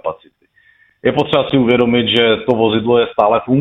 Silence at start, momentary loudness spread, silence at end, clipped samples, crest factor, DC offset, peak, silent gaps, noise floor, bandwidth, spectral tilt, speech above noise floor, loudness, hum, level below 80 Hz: 0.05 s; 5 LU; 0 s; under 0.1%; 14 dB; under 0.1%; 0 dBFS; none; -54 dBFS; 6.6 kHz; -7.5 dB/octave; 41 dB; -14 LUFS; none; -48 dBFS